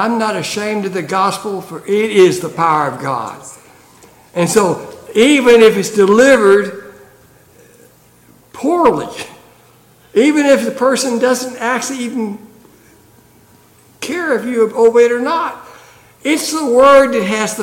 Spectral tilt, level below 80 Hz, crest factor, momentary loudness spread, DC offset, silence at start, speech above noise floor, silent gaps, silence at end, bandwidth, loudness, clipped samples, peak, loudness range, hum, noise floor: -4 dB/octave; -54 dBFS; 14 dB; 17 LU; under 0.1%; 0 s; 35 dB; none; 0 s; 17 kHz; -13 LUFS; under 0.1%; 0 dBFS; 9 LU; none; -47 dBFS